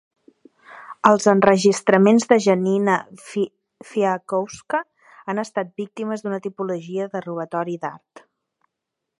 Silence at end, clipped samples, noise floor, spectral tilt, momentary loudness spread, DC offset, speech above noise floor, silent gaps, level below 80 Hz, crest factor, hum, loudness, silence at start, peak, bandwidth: 1.2 s; under 0.1%; -82 dBFS; -5.5 dB/octave; 14 LU; under 0.1%; 62 dB; none; -66 dBFS; 20 dB; none; -20 LUFS; 0.7 s; 0 dBFS; 11.5 kHz